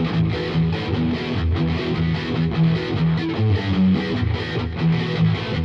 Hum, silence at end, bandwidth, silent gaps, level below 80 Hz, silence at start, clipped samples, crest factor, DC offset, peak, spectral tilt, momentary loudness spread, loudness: none; 0 s; 6.4 kHz; none; -38 dBFS; 0 s; under 0.1%; 12 dB; under 0.1%; -8 dBFS; -8 dB/octave; 4 LU; -21 LUFS